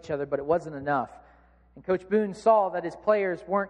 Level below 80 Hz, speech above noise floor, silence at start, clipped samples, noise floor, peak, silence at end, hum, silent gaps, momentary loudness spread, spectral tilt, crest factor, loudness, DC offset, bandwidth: -60 dBFS; 32 dB; 0.05 s; under 0.1%; -58 dBFS; -10 dBFS; 0 s; none; none; 8 LU; -7 dB/octave; 18 dB; -26 LUFS; under 0.1%; 9.4 kHz